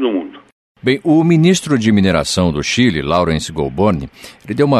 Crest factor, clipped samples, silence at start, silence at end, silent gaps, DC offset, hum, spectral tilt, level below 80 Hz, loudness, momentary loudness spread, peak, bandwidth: 14 dB; under 0.1%; 0 s; 0 s; 0.52-0.75 s; under 0.1%; none; -5.5 dB/octave; -38 dBFS; -15 LUFS; 11 LU; -2 dBFS; 13.5 kHz